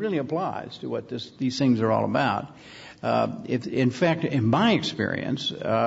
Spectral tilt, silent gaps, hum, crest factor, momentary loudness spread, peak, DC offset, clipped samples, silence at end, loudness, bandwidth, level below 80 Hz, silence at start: -6.5 dB/octave; none; none; 18 dB; 11 LU; -6 dBFS; under 0.1%; under 0.1%; 0 s; -25 LUFS; 8 kHz; -64 dBFS; 0 s